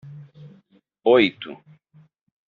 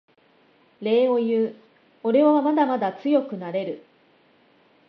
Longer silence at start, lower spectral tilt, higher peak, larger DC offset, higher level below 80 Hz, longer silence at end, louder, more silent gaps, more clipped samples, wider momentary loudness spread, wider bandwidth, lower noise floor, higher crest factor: second, 0.05 s vs 0.8 s; second, -3 dB/octave vs -8.5 dB/octave; first, -4 dBFS vs -8 dBFS; neither; first, -68 dBFS vs -80 dBFS; second, 0.95 s vs 1.1 s; first, -19 LUFS vs -22 LUFS; neither; neither; first, 26 LU vs 12 LU; second, 4.7 kHz vs 5.6 kHz; about the same, -59 dBFS vs -59 dBFS; first, 22 dB vs 16 dB